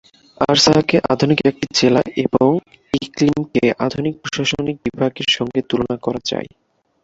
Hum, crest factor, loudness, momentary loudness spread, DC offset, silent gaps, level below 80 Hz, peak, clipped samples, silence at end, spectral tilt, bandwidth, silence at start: none; 18 dB; -17 LUFS; 10 LU; under 0.1%; none; -48 dBFS; 0 dBFS; under 0.1%; 0.55 s; -4.5 dB/octave; 8 kHz; 0.4 s